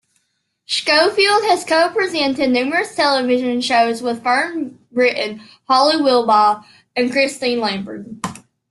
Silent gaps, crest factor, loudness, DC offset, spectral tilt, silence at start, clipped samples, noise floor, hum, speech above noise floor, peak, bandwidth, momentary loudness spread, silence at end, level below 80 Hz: none; 16 dB; -16 LUFS; under 0.1%; -3 dB/octave; 0.7 s; under 0.1%; -69 dBFS; none; 52 dB; -2 dBFS; 12.5 kHz; 13 LU; 0.3 s; -62 dBFS